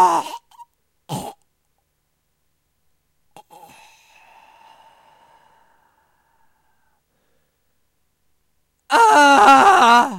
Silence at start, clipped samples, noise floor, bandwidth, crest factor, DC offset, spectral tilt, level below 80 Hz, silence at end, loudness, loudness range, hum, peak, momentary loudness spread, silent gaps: 0 s; under 0.1%; -70 dBFS; 16 kHz; 18 dB; under 0.1%; -2.5 dB/octave; -60 dBFS; 0 s; -12 LUFS; 24 LU; none; -2 dBFS; 24 LU; none